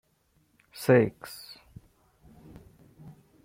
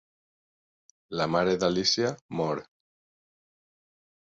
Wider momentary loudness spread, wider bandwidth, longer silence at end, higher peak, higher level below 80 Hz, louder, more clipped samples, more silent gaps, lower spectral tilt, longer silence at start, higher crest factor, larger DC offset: first, 27 LU vs 9 LU; first, 16.5 kHz vs 7.8 kHz; first, 2.1 s vs 1.7 s; about the same, -8 dBFS vs -10 dBFS; about the same, -62 dBFS vs -62 dBFS; about the same, -25 LUFS vs -27 LUFS; neither; second, none vs 2.21-2.29 s; first, -6.5 dB/octave vs -4 dB/octave; second, 0.8 s vs 1.1 s; about the same, 22 dB vs 20 dB; neither